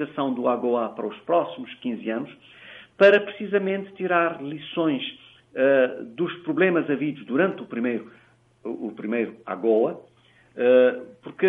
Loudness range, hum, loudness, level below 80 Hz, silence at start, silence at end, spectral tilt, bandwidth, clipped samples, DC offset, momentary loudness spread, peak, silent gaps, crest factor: 4 LU; none; -24 LUFS; -74 dBFS; 0 s; 0 s; -8 dB/octave; 5.8 kHz; under 0.1%; under 0.1%; 17 LU; -4 dBFS; none; 20 dB